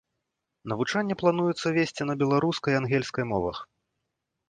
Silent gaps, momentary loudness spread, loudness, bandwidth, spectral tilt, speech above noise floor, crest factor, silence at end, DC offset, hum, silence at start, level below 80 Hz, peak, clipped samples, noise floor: none; 8 LU; -27 LUFS; 9.6 kHz; -6 dB/octave; 56 dB; 20 dB; 0.85 s; under 0.1%; none; 0.65 s; -58 dBFS; -8 dBFS; under 0.1%; -82 dBFS